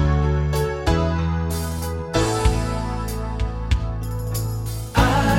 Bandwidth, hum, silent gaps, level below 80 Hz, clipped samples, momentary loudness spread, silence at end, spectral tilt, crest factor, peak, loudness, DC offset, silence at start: 16.5 kHz; none; none; -26 dBFS; under 0.1%; 7 LU; 0 s; -6 dB/octave; 18 dB; -4 dBFS; -23 LUFS; under 0.1%; 0 s